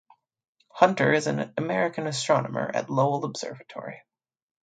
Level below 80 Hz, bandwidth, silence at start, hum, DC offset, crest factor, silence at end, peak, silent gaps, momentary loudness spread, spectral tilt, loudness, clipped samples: -72 dBFS; 9.4 kHz; 0.75 s; none; under 0.1%; 24 dB; 0.65 s; -4 dBFS; none; 16 LU; -5 dB/octave; -25 LUFS; under 0.1%